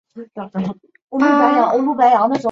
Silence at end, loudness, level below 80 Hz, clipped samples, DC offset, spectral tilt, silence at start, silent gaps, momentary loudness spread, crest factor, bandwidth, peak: 0 s; -15 LUFS; -62 dBFS; under 0.1%; under 0.1%; -7 dB/octave; 0.15 s; 1.02-1.08 s; 14 LU; 14 dB; 7.6 kHz; -2 dBFS